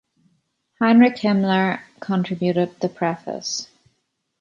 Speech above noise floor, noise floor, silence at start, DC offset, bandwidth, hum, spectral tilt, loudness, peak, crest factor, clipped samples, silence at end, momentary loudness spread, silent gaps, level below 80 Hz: 53 dB; -72 dBFS; 0.8 s; under 0.1%; 7.4 kHz; none; -5.5 dB/octave; -20 LUFS; -4 dBFS; 18 dB; under 0.1%; 0.75 s; 13 LU; none; -66 dBFS